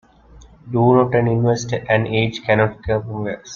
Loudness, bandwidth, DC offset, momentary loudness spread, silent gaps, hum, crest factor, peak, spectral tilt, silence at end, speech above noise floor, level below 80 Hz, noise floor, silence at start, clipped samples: -18 LUFS; 7.2 kHz; under 0.1%; 9 LU; none; none; 16 dB; -2 dBFS; -6.5 dB/octave; 0 s; 28 dB; -46 dBFS; -45 dBFS; 0.35 s; under 0.1%